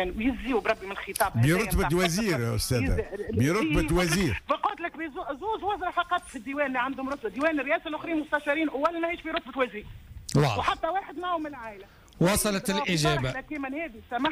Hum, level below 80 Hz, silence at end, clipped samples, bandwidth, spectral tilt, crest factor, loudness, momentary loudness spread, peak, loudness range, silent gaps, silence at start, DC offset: none; -42 dBFS; 0 s; under 0.1%; 15.5 kHz; -5 dB/octave; 14 dB; -28 LUFS; 10 LU; -12 dBFS; 3 LU; none; 0 s; under 0.1%